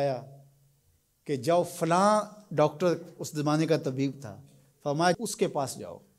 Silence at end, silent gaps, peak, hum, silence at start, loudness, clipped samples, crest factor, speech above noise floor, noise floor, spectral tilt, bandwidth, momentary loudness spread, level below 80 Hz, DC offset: 0.2 s; none; -10 dBFS; none; 0 s; -28 LUFS; under 0.1%; 18 dB; 41 dB; -69 dBFS; -5.5 dB/octave; 16 kHz; 13 LU; -72 dBFS; under 0.1%